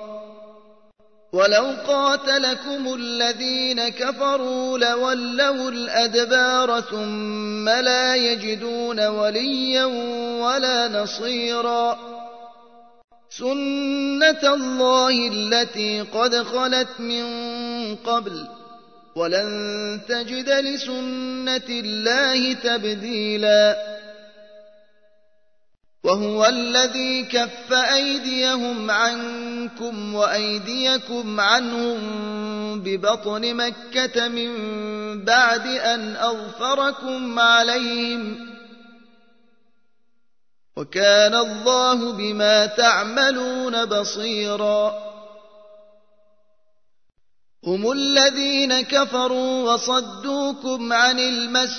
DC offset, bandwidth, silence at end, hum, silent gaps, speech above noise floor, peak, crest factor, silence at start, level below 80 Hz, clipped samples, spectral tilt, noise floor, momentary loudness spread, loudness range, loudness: 0.2%; 6.6 kHz; 0 s; none; 13.04-13.08 s; 59 dB; -2 dBFS; 20 dB; 0 s; -70 dBFS; under 0.1%; -2 dB/octave; -79 dBFS; 12 LU; 5 LU; -20 LUFS